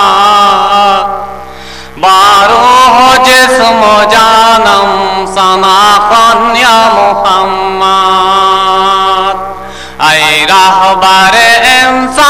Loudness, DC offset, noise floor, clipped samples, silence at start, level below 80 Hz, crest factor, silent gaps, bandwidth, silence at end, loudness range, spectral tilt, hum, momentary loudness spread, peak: -4 LUFS; 1%; -25 dBFS; 0.4%; 0 s; -36 dBFS; 6 dB; none; 17.5 kHz; 0 s; 3 LU; -2 dB/octave; none; 9 LU; 0 dBFS